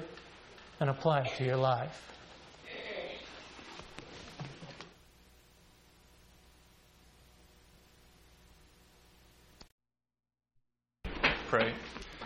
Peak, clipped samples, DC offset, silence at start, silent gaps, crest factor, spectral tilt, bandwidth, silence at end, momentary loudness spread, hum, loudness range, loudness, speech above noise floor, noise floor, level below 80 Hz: -12 dBFS; under 0.1%; under 0.1%; 0 s; 9.72-9.78 s; 26 dB; -6 dB/octave; 14.5 kHz; 0 s; 22 LU; none; 26 LU; -34 LUFS; 46 dB; -77 dBFS; -58 dBFS